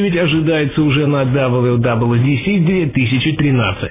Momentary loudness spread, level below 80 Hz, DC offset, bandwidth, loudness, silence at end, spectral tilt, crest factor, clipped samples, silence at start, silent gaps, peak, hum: 1 LU; -38 dBFS; under 0.1%; 3.9 kHz; -14 LUFS; 0 s; -11.5 dB/octave; 10 dB; under 0.1%; 0 s; none; -4 dBFS; none